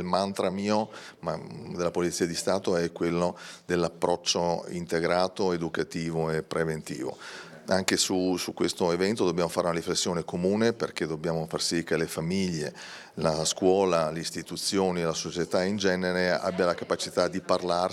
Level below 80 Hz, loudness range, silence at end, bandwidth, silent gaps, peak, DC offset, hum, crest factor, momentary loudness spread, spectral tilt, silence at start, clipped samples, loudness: -64 dBFS; 2 LU; 0 s; 15.5 kHz; none; -4 dBFS; under 0.1%; none; 24 dB; 8 LU; -4 dB/octave; 0 s; under 0.1%; -28 LUFS